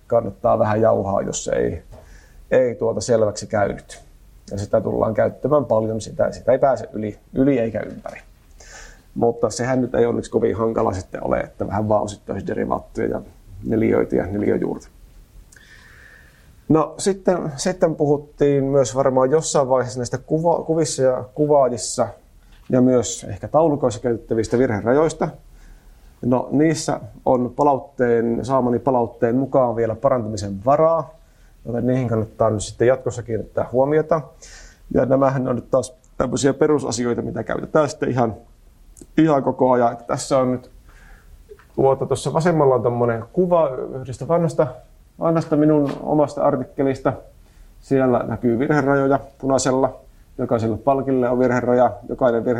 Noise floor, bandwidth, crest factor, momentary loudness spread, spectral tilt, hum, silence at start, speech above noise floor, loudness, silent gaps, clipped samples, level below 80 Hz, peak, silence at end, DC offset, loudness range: -48 dBFS; 13 kHz; 16 dB; 9 LU; -6 dB/octave; none; 0.1 s; 29 dB; -20 LUFS; none; under 0.1%; -46 dBFS; -4 dBFS; 0 s; under 0.1%; 4 LU